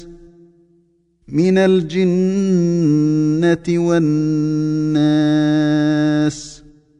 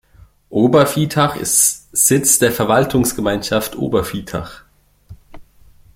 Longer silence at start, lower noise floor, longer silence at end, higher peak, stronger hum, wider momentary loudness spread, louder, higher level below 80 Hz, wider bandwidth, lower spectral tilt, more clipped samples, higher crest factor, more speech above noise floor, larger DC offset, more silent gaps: second, 0 s vs 0.5 s; first, -58 dBFS vs -47 dBFS; about the same, 0.45 s vs 0.55 s; second, -4 dBFS vs 0 dBFS; neither; second, 4 LU vs 12 LU; about the same, -16 LUFS vs -15 LUFS; second, -50 dBFS vs -44 dBFS; second, 9.4 kHz vs 16.5 kHz; first, -7.5 dB/octave vs -4 dB/octave; neither; second, 12 dB vs 18 dB; first, 43 dB vs 31 dB; neither; neither